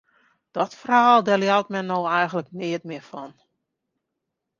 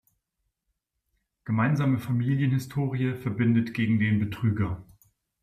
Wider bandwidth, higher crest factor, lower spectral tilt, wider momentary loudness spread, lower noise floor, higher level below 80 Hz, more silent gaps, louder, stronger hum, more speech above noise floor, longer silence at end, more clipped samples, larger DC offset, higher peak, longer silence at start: second, 7.4 kHz vs 15 kHz; first, 20 dB vs 14 dB; second, -5.5 dB/octave vs -8 dB/octave; first, 19 LU vs 6 LU; about the same, -81 dBFS vs -80 dBFS; second, -72 dBFS vs -58 dBFS; neither; first, -21 LUFS vs -26 LUFS; neither; first, 60 dB vs 55 dB; first, 1.3 s vs 0.6 s; neither; neither; first, -4 dBFS vs -12 dBFS; second, 0.55 s vs 1.45 s